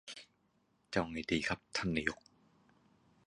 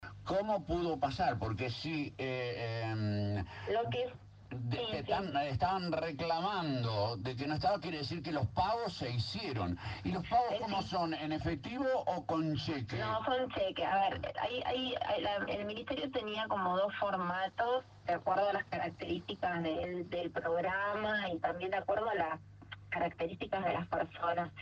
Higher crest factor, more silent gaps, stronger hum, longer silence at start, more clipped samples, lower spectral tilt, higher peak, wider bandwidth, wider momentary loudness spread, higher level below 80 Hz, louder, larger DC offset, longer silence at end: first, 26 dB vs 16 dB; neither; neither; about the same, 0.05 s vs 0 s; neither; second, -4.5 dB/octave vs -6.5 dB/octave; first, -14 dBFS vs -20 dBFS; first, 11 kHz vs 8.6 kHz; first, 16 LU vs 5 LU; about the same, -60 dBFS vs -58 dBFS; about the same, -37 LUFS vs -36 LUFS; neither; first, 1.1 s vs 0 s